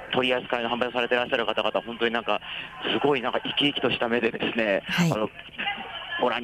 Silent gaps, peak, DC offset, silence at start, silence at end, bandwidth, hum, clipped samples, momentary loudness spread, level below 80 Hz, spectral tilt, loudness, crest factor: none; -10 dBFS; under 0.1%; 0 s; 0 s; 15.5 kHz; none; under 0.1%; 7 LU; -60 dBFS; -5 dB/octave; -26 LUFS; 16 dB